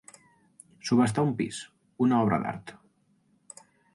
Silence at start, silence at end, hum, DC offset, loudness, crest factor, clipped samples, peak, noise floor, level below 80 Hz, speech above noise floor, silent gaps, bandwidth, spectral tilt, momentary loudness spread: 0.85 s; 1.2 s; none; under 0.1%; -27 LUFS; 18 dB; under 0.1%; -12 dBFS; -68 dBFS; -64 dBFS; 42 dB; none; 11.5 kHz; -6 dB/octave; 25 LU